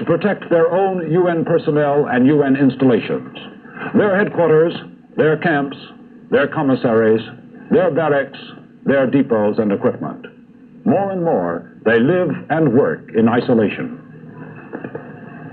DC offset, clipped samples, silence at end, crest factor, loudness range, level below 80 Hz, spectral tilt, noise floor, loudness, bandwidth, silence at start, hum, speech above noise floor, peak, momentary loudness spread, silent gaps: under 0.1%; under 0.1%; 0 s; 14 dB; 3 LU; -60 dBFS; -10.5 dB/octave; -42 dBFS; -16 LUFS; 4.5 kHz; 0 s; none; 27 dB; -4 dBFS; 19 LU; none